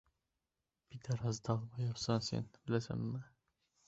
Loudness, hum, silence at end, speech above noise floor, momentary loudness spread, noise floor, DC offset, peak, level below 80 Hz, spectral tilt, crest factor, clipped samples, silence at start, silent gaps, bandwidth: -40 LUFS; none; 0.6 s; 51 dB; 9 LU; -90 dBFS; under 0.1%; -20 dBFS; -66 dBFS; -6.5 dB/octave; 22 dB; under 0.1%; 0.9 s; none; 8 kHz